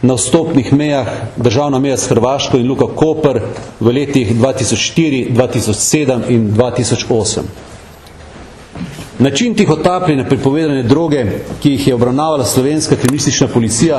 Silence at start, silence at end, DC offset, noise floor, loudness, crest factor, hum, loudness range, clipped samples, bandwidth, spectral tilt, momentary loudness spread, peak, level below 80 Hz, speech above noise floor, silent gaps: 0 s; 0 s; under 0.1%; -35 dBFS; -13 LUFS; 12 dB; none; 3 LU; under 0.1%; 13.5 kHz; -5 dB/octave; 5 LU; 0 dBFS; -40 dBFS; 23 dB; none